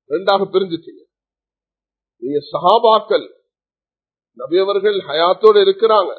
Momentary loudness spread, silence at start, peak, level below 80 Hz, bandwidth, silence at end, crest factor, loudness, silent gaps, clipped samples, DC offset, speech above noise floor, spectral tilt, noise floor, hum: 13 LU; 0.1 s; 0 dBFS; -72 dBFS; 4.6 kHz; 0.05 s; 16 dB; -15 LUFS; none; under 0.1%; under 0.1%; over 75 dB; -7 dB/octave; under -90 dBFS; none